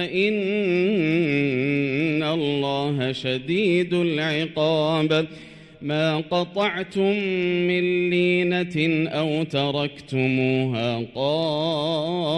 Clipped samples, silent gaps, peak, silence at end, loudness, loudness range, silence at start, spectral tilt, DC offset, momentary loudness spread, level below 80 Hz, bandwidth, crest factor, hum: under 0.1%; none; -8 dBFS; 0 s; -22 LUFS; 1 LU; 0 s; -7 dB/octave; under 0.1%; 4 LU; -60 dBFS; 10.5 kHz; 14 dB; none